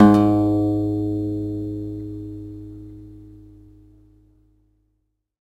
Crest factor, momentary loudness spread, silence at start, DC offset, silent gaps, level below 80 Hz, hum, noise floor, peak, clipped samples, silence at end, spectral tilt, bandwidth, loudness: 22 dB; 24 LU; 0 s; under 0.1%; none; -46 dBFS; none; -72 dBFS; -2 dBFS; under 0.1%; 2.1 s; -9.5 dB/octave; 8.6 kHz; -21 LUFS